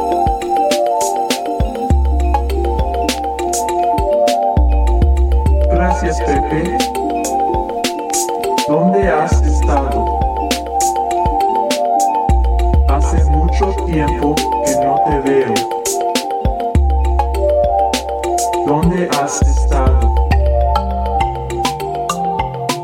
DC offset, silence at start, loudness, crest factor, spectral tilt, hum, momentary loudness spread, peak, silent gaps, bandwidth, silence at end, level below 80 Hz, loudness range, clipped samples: under 0.1%; 0 s; -15 LUFS; 12 dB; -5.5 dB/octave; none; 4 LU; -2 dBFS; none; 16 kHz; 0 s; -18 dBFS; 2 LU; under 0.1%